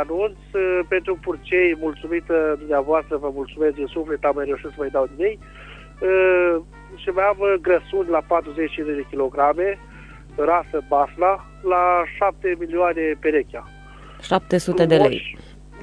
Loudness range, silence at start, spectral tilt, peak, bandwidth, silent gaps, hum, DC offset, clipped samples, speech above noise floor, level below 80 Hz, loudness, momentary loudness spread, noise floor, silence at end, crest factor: 2 LU; 0 s; -6.5 dB/octave; -4 dBFS; 11 kHz; none; none; under 0.1%; under 0.1%; 21 dB; -44 dBFS; -21 LUFS; 10 LU; -41 dBFS; 0 s; 18 dB